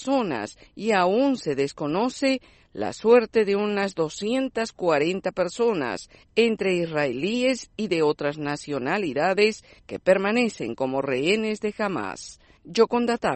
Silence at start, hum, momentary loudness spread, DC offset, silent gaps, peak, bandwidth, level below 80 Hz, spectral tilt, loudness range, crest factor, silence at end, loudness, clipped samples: 0 s; none; 10 LU; under 0.1%; none; -6 dBFS; 8.8 kHz; -60 dBFS; -5 dB/octave; 2 LU; 18 dB; 0 s; -24 LUFS; under 0.1%